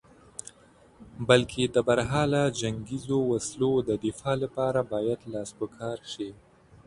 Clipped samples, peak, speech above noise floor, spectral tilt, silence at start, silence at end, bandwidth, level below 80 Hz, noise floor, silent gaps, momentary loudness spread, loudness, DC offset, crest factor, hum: under 0.1%; -4 dBFS; 30 dB; -5 dB/octave; 1 s; 0.55 s; 11.5 kHz; -54 dBFS; -57 dBFS; none; 14 LU; -28 LUFS; under 0.1%; 24 dB; none